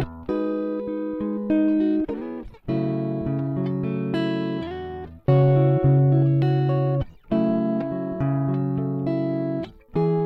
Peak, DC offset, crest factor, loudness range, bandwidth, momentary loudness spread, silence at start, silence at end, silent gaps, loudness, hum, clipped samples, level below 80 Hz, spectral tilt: -8 dBFS; under 0.1%; 16 dB; 5 LU; 4.6 kHz; 11 LU; 0 s; 0 s; none; -23 LUFS; none; under 0.1%; -48 dBFS; -11 dB/octave